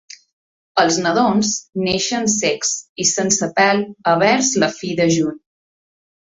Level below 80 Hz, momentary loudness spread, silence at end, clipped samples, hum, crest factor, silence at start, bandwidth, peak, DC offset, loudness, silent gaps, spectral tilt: -56 dBFS; 6 LU; 0.95 s; under 0.1%; none; 18 dB; 0.1 s; 8 kHz; 0 dBFS; under 0.1%; -17 LUFS; 0.33-0.75 s, 2.89-2.96 s; -3 dB/octave